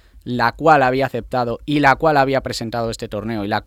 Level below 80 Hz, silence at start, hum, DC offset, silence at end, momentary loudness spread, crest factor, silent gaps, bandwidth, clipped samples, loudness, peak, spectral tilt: -42 dBFS; 0.15 s; none; under 0.1%; 0.05 s; 11 LU; 18 dB; none; 16 kHz; under 0.1%; -18 LUFS; 0 dBFS; -5.5 dB/octave